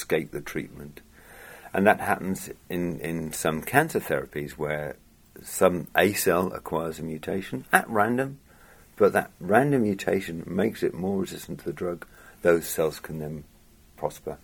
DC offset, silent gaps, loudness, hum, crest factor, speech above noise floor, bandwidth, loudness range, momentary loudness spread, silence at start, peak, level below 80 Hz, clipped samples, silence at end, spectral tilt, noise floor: under 0.1%; none; -26 LUFS; none; 26 dB; 27 dB; 18.5 kHz; 4 LU; 13 LU; 0 s; -2 dBFS; -54 dBFS; under 0.1%; 0.05 s; -5 dB/octave; -53 dBFS